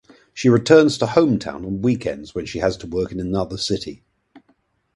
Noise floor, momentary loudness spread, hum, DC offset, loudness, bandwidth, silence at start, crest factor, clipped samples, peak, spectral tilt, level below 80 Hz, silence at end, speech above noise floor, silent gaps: -63 dBFS; 14 LU; none; under 0.1%; -19 LUFS; 11.5 kHz; 0.35 s; 20 dB; under 0.1%; 0 dBFS; -6 dB/octave; -46 dBFS; 0.6 s; 45 dB; none